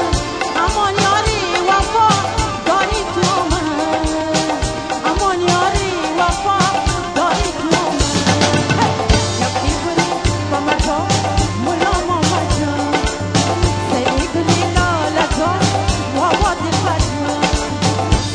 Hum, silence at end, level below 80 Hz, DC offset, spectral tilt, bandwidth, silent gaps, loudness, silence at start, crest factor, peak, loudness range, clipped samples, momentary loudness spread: none; 0 s; -26 dBFS; 0.1%; -4.5 dB/octave; 10.5 kHz; none; -16 LUFS; 0 s; 16 dB; 0 dBFS; 1 LU; under 0.1%; 4 LU